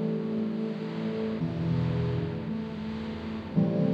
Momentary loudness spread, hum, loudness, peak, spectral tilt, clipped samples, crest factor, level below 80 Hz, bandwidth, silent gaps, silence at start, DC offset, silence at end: 7 LU; none; -31 LUFS; -14 dBFS; -9.5 dB/octave; under 0.1%; 16 dB; -52 dBFS; 6.2 kHz; none; 0 s; under 0.1%; 0 s